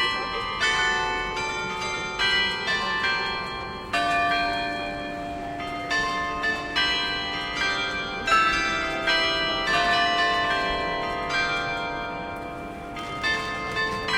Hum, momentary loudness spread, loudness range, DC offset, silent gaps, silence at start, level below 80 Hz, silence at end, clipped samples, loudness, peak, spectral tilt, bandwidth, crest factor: none; 11 LU; 4 LU; under 0.1%; none; 0 s; -46 dBFS; 0 s; under 0.1%; -24 LUFS; -8 dBFS; -2.5 dB/octave; 16 kHz; 18 dB